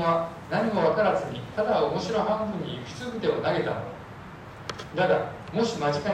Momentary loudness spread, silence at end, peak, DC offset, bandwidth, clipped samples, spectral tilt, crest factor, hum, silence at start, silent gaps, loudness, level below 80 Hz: 14 LU; 0 s; -12 dBFS; under 0.1%; 13 kHz; under 0.1%; -6 dB/octave; 16 dB; none; 0 s; none; -27 LUFS; -56 dBFS